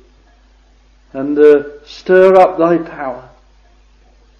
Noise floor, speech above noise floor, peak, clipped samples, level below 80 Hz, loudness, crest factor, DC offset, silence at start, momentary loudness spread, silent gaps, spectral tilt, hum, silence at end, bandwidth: -48 dBFS; 37 dB; 0 dBFS; 0.2%; -48 dBFS; -11 LUFS; 14 dB; under 0.1%; 1.15 s; 21 LU; none; -7.5 dB/octave; none; 1.2 s; 7.2 kHz